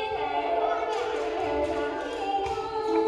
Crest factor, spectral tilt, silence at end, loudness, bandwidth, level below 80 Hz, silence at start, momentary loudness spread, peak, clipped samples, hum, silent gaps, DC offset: 14 dB; -5 dB/octave; 0 s; -28 LUFS; 11 kHz; -52 dBFS; 0 s; 3 LU; -14 dBFS; under 0.1%; none; none; under 0.1%